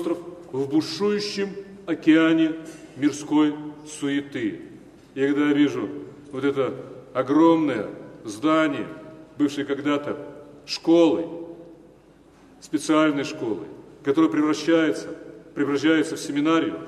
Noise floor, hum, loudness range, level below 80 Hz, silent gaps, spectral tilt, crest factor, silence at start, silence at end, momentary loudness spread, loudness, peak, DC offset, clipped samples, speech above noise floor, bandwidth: -52 dBFS; none; 3 LU; -64 dBFS; none; -5.5 dB/octave; 18 dB; 0 s; 0 s; 19 LU; -23 LUFS; -6 dBFS; under 0.1%; under 0.1%; 30 dB; 12 kHz